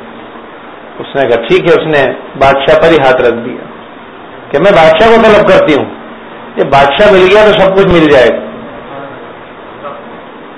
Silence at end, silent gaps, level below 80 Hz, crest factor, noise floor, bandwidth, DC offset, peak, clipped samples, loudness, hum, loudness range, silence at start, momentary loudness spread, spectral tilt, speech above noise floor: 0 s; none; -34 dBFS; 8 dB; -29 dBFS; 11 kHz; under 0.1%; 0 dBFS; 3%; -6 LUFS; none; 3 LU; 0 s; 24 LU; -6 dB/octave; 23 dB